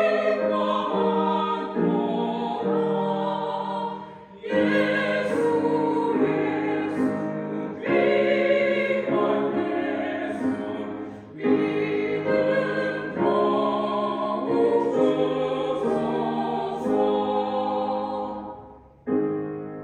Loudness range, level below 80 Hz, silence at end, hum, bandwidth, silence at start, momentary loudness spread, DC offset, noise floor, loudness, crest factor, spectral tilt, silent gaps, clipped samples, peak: 3 LU; -64 dBFS; 0 s; none; 9.8 kHz; 0 s; 9 LU; under 0.1%; -46 dBFS; -24 LUFS; 16 dB; -7 dB/octave; none; under 0.1%; -8 dBFS